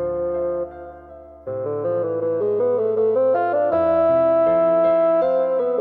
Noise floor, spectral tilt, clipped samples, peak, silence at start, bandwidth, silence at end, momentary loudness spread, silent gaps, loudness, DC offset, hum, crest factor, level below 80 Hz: -41 dBFS; -10 dB/octave; under 0.1%; -8 dBFS; 0 s; 4.3 kHz; 0 s; 12 LU; none; -19 LUFS; under 0.1%; none; 10 dB; -54 dBFS